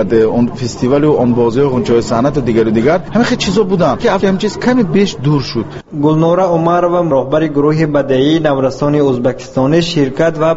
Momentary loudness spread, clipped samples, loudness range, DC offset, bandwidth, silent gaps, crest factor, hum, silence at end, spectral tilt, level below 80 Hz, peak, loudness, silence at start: 4 LU; under 0.1%; 1 LU; under 0.1%; 8 kHz; none; 12 dB; none; 0 s; -6 dB/octave; -38 dBFS; 0 dBFS; -12 LUFS; 0 s